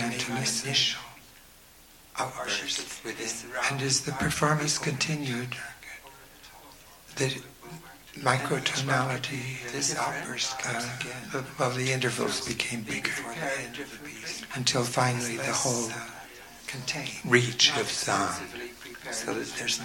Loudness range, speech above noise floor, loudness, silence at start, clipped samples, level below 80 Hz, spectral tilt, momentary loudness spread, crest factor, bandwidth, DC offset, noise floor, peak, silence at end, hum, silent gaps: 4 LU; 24 dB; -28 LUFS; 0 s; under 0.1%; -58 dBFS; -3 dB/octave; 17 LU; 24 dB; 18.5 kHz; under 0.1%; -54 dBFS; -6 dBFS; 0 s; none; none